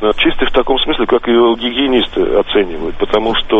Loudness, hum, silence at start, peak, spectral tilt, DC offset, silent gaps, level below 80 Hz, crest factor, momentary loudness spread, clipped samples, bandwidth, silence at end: -13 LUFS; none; 0 s; 0 dBFS; -6 dB/octave; under 0.1%; none; -28 dBFS; 12 dB; 4 LU; under 0.1%; 4.3 kHz; 0 s